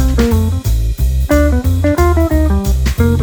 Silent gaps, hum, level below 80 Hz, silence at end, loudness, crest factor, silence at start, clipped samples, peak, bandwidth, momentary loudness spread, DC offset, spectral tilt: none; none; -14 dBFS; 0 s; -14 LUFS; 12 dB; 0 s; under 0.1%; 0 dBFS; over 20 kHz; 4 LU; under 0.1%; -7 dB/octave